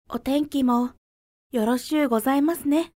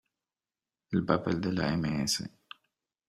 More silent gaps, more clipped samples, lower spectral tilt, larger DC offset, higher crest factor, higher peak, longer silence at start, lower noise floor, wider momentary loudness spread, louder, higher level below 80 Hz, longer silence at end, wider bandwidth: first, 0.98-1.50 s vs none; neither; about the same, -4.5 dB/octave vs -5 dB/octave; neither; second, 14 dB vs 24 dB; about the same, -10 dBFS vs -8 dBFS; second, 0.1 s vs 0.9 s; about the same, under -90 dBFS vs under -90 dBFS; second, 5 LU vs 8 LU; first, -23 LUFS vs -30 LUFS; about the same, -56 dBFS vs -58 dBFS; second, 0.1 s vs 0.8 s; about the same, 16 kHz vs 15 kHz